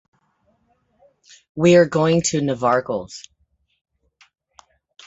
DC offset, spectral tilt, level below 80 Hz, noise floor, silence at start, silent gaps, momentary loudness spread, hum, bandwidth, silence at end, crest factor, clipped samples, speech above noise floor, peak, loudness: under 0.1%; -5.5 dB/octave; -58 dBFS; -65 dBFS; 1.55 s; none; 23 LU; none; 8 kHz; 1.85 s; 20 dB; under 0.1%; 47 dB; -2 dBFS; -18 LUFS